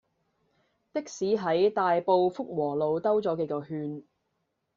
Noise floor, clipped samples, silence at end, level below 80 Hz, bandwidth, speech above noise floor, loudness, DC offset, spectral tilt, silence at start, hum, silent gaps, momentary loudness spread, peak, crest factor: -78 dBFS; under 0.1%; 0.75 s; -72 dBFS; 7.6 kHz; 52 dB; -28 LUFS; under 0.1%; -5.5 dB/octave; 0.95 s; none; none; 12 LU; -12 dBFS; 18 dB